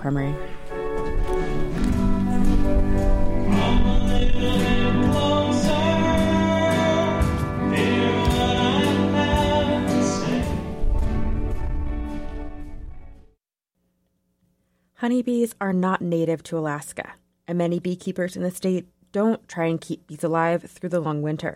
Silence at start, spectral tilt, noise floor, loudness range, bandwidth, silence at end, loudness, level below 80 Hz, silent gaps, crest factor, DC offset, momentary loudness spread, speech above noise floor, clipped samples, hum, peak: 0 s; -6 dB/octave; -76 dBFS; 10 LU; 14 kHz; 0 s; -23 LUFS; -28 dBFS; none; 12 dB; under 0.1%; 10 LU; 52 dB; under 0.1%; none; -8 dBFS